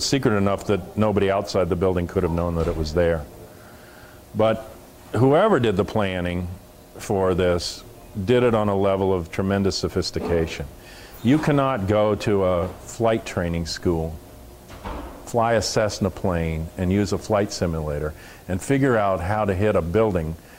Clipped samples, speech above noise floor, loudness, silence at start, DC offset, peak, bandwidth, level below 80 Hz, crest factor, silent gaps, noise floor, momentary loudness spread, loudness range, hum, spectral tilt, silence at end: under 0.1%; 23 dB; -22 LUFS; 0 s; under 0.1%; -6 dBFS; 16 kHz; -40 dBFS; 16 dB; none; -44 dBFS; 14 LU; 3 LU; none; -6 dB/octave; 0 s